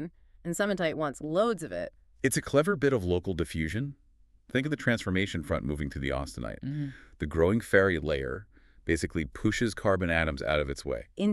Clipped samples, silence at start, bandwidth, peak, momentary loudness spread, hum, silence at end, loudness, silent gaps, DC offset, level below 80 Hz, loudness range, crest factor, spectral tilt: under 0.1%; 0 s; 13.5 kHz; -8 dBFS; 11 LU; none; 0 s; -30 LUFS; none; under 0.1%; -46 dBFS; 3 LU; 22 dB; -5.5 dB/octave